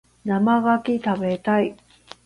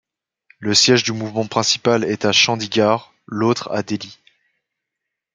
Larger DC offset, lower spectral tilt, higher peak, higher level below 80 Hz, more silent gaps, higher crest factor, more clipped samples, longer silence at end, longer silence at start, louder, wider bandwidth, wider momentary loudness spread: neither; first, -8 dB/octave vs -3 dB/octave; second, -8 dBFS vs 0 dBFS; about the same, -60 dBFS vs -64 dBFS; neither; second, 14 dB vs 20 dB; neither; second, 0.5 s vs 1.2 s; second, 0.25 s vs 0.6 s; second, -21 LUFS vs -17 LUFS; about the same, 10.5 kHz vs 9.6 kHz; second, 6 LU vs 13 LU